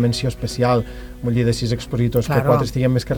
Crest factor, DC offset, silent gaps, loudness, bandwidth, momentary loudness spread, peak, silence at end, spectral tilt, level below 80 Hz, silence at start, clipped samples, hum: 16 dB; under 0.1%; none; -20 LUFS; 19.5 kHz; 6 LU; -2 dBFS; 0 s; -6.5 dB/octave; -36 dBFS; 0 s; under 0.1%; none